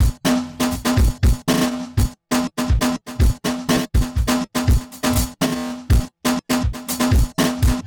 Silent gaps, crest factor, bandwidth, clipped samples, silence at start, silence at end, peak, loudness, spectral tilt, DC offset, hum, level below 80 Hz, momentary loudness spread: none; 12 dB; 19.5 kHz; under 0.1%; 0 s; 0 s; -8 dBFS; -20 LUFS; -5 dB/octave; under 0.1%; none; -22 dBFS; 4 LU